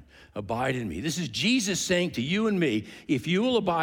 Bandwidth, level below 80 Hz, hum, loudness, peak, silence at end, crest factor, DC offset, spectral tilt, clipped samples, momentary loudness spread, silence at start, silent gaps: 18 kHz; -56 dBFS; none; -27 LUFS; -10 dBFS; 0 s; 16 dB; under 0.1%; -4.5 dB/octave; under 0.1%; 7 LU; 0 s; none